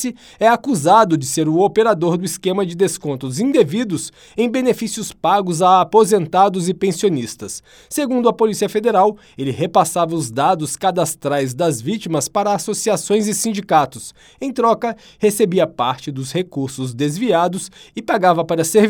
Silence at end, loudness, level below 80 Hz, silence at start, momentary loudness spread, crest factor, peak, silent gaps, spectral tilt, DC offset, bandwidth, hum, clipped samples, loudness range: 0 s; -17 LUFS; -58 dBFS; 0 s; 11 LU; 16 dB; 0 dBFS; none; -5 dB/octave; under 0.1%; 19.5 kHz; none; under 0.1%; 3 LU